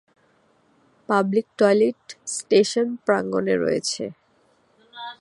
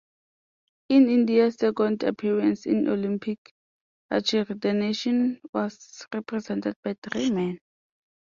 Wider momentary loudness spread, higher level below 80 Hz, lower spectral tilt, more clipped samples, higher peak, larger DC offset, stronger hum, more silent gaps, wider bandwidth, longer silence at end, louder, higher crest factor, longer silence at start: about the same, 14 LU vs 13 LU; about the same, -68 dBFS vs -68 dBFS; second, -4.5 dB/octave vs -6 dB/octave; neither; first, -4 dBFS vs -10 dBFS; neither; neither; second, none vs 3.38-3.45 s, 3.51-4.09 s, 5.49-5.53 s, 6.76-6.83 s, 6.98-7.02 s; first, 11.5 kHz vs 7.4 kHz; second, 0.05 s vs 0.7 s; first, -22 LUFS vs -25 LUFS; about the same, 20 dB vs 16 dB; first, 1.1 s vs 0.9 s